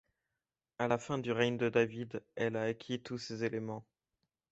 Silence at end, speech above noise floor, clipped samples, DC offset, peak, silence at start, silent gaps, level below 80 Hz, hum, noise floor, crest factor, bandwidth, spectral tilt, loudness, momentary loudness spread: 0.7 s; over 55 dB; under 0.1%; under 0.1%; -16 dBFS; 0.8 s; none; -72 dBFS; none; under -90 dBFS; 20 dB; 8 kHz; -4.5 dB/octave; -36 LUFS; 11 LU